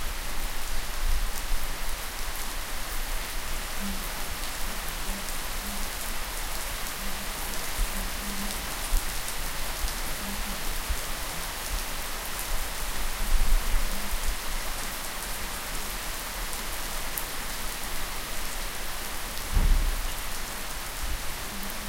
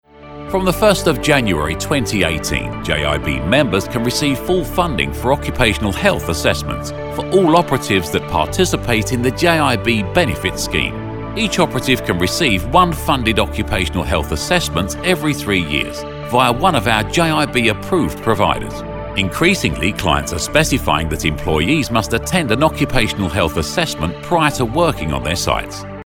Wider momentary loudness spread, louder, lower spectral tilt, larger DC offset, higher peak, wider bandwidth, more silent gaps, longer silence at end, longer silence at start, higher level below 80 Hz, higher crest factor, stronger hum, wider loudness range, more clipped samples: second, 3 LU vs 6 LU; second, -32 LUFS vs -16 LUFS; second, -2 dB/octave vs -4.5 dB/octave; second, under 0.1% vs 0.5%; second, -6 dBFS vs 0 dBFS; second, 17 kHz vs 19 kHz; neither; about the same, 0 s vs 0.05 s; second, 0 s vs 0.15 s; about the same, -32 dBFS vs -30 dBFS; first, 22 dB vs 16 dB; neither; about the same, 2 LU vs 1 LU; neither